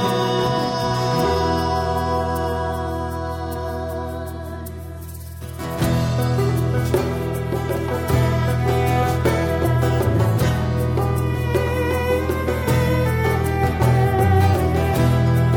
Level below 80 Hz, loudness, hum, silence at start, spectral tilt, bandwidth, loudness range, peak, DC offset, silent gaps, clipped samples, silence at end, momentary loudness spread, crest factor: -32 dBFS; -20 LUFS; none; 0 s; -6.5 dB/octave; 18 kHz; 7 LU; -4 dBFS; under 0.1%; none; under 0.1%; 0 s; 10 LU; 14 dB